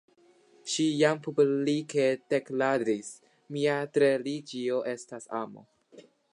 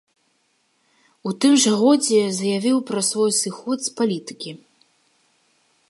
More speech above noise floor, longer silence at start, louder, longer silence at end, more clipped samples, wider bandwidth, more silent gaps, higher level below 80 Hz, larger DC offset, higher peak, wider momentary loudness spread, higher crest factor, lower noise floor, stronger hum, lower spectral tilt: second, 34 dB vs 47 dB; second, 0.65 s vs 1.25 s; second, -28 LUFS vs -19 LUFS; second, 0.3 s vs 1.35 s; neither; about the same, 11 kHz vs 12 kHz; neither; second, -84 dBFS vs -76 dBFS; neither; second, -10 dBFS vs -6 dBFS; second, 12 LU vs 16 LU; about the same, 20 dB vs 16 dB; second, -62 dBFS vs -66 dBFS; neither; first, -5 dB/octave vs -3.5 dB/octave